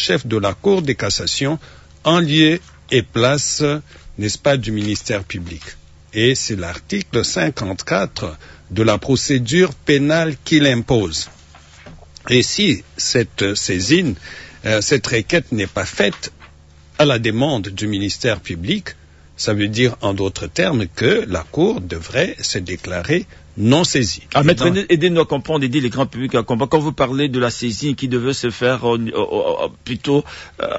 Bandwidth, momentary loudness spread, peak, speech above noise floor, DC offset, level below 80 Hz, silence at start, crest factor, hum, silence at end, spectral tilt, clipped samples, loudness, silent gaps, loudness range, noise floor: 8 kHz; 10 LU; -2 dBFS; 27 dB; under 0.1%; -44 dBFS; 0 s; 16 dB; none; 0 s; -4.5 dB/octave; under 0.1%; -18 LUFS; none; 4 LU; -45 dBFS